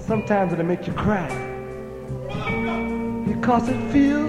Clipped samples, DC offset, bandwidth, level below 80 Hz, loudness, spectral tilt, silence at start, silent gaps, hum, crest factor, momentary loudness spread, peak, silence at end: under 0.1%; under 0.1%; 11.5 kHz; -42 dBFS; -23 LUFS; -7.5 dB/octave; 0 s; none; none; 18 dB; 12 LU; -6 dBFS; 0 s